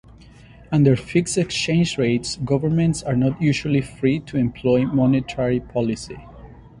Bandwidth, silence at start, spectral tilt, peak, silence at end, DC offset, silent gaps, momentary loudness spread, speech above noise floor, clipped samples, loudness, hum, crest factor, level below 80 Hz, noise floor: 11.5 kHz; 0.6 s; -6 dB/octave; -4 dBFS; 0.1 s; under 0.1%; none; 6 LU; 25 dB; under 0.1%; -21 LUFS; none; 18 dB; -46 dBFS; -45 dBFS